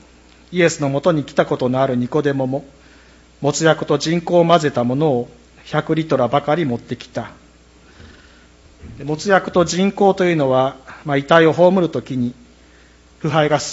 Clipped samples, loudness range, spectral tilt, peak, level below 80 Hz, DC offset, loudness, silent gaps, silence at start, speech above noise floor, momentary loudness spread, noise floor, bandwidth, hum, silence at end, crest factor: under 0.1%; 6 LU; -5.5 dB/octave; 0 dBFS; -50 dBFS; under 0.1%; -17 LUFS; none; 0.5 s; 31 dB; 13 LU; -48 dBFS; 8 kHz; none; 0 s; 18 dB